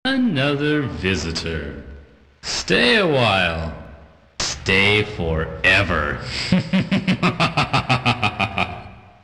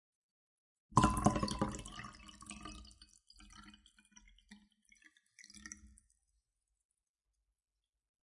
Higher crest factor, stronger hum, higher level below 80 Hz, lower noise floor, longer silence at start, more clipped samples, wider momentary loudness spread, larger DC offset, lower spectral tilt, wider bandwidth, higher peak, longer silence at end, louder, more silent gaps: second, 16 dB vs 30 dB; neither; first, -38 dBFS vs -54 dBFS; second, -45 dBFS vs under -90 dBFS; second, 0.05 s vs 0.9 s; neither; second, 13 LU vs 26 LU; neither; about the same, -4.5 dB/octave vs -5 dB/octave; about the same, 11.5 kHz vs 11.5 kHz; first, -4 dBFS vs -12 dBFS; second, 0.25 s vs 2.45 s; first, -19 LUFS vs -36 LUFS; neither